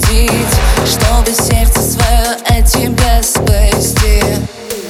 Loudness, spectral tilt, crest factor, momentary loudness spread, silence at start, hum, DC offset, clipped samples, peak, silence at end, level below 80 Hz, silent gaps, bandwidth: -11 LUFS; -4 dB/octave; 10 dB; 2 LU; 0 s; none; under 0.1%; under 0.1%; 0 dBFS; 0 s; -12 dBFS; none; 16.5 kHz